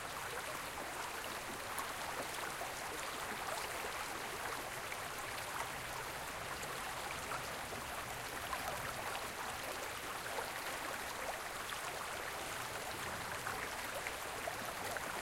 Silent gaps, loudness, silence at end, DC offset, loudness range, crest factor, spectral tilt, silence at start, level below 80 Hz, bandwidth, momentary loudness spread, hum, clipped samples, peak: none; -42 LUFS; 0 s; under 0.1%; 1 LU; 20 dB; -2 dB/octave; 0 s; -62 dBFS; 16 kHz; 2 LU; none; under 0.1%; -24 dBFS